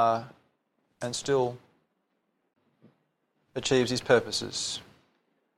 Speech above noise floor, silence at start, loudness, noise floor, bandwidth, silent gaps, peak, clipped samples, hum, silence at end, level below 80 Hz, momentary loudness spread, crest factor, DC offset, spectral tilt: 49 dB; 0 s; -28 LUFS; -77 dBFS; 14 kHz; none; -6 dBFS; under 0.1%; none; 0.75 s; -64 dBFS; 15 LU; 24 dB; under 0.1%; -3.5 dB/octave